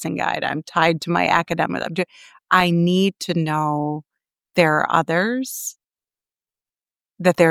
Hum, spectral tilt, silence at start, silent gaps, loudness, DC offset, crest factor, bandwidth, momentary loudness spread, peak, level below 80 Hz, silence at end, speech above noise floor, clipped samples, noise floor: none; -5 dB/octave; 0 s; none; -20 LUFS; under 0.1%; 20 dB; 17.5 kHz; 10 LU; -2 dBFS; -58 dBFS; 0 s; over 71 dB; under 0.1%; under -90 dBFS